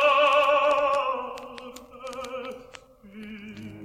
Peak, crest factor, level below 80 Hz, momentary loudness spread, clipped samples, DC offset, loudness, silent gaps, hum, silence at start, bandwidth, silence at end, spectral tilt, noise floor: -8 dBFS; 18 dB; -62 dBFS; 22 LU; under 0.1%; under 0.1%; -23 LUFS; none; none; 0 s; 15 kHz; 0 s; -3 dB/octave; -49 dBFS